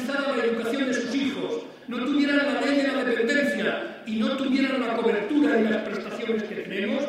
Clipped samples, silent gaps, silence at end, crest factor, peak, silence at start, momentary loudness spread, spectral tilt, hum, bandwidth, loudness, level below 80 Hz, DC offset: under 0.1%; none; 0 s; 16 dB; -8 dBFS; 0 s; 9 LU; -5 dB/octave; none; 13.5 kHz; -25 LUFS; -68 dBFS; under 0.1%